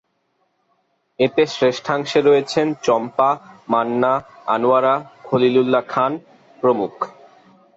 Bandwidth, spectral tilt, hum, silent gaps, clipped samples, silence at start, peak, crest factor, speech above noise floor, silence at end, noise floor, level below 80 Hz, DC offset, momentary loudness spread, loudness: 8 kHz; -5.5 dB/octave; none; none; under 0.1%; 1.2 s; -4 dBFS; 16 dB; 50 dB; 0.65 s; -67 dBFS; -62 dBFS; under 0.1%; 7 LU; -19 LUFS